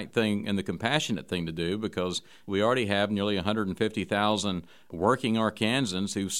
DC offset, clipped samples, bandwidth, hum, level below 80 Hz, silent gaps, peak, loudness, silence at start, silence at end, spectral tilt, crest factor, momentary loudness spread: 0.2%; under 0.1%; 15.5 kHz; none; -60 dBFS; none; -8 dBFS; -28 LUFS; 0 s; 0 s; -4.5 dB/octave; 20 dB; 7 LU